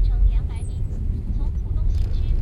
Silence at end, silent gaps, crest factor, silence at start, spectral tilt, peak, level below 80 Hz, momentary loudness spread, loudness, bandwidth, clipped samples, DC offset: 0 s; none; 12 dB; 0 s; -8 dB/octave; -8 dBFS; -22 dBFS; 6 LU; -26 LUFS; 8.6 kHz; under 0.1%; under 0.1%